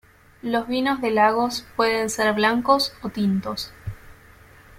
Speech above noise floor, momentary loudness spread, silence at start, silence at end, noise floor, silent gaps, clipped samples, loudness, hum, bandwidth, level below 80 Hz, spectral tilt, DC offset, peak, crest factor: 27 dB; 13 LU; 0.45 s; 0.65 s; -49 dBFS; none; under 0.1%; -22 LUFS; none; 16.5 kHz; -52 dBFS; -4.5 dB/octave; under 0.1%; -4 dBFS; 18 dB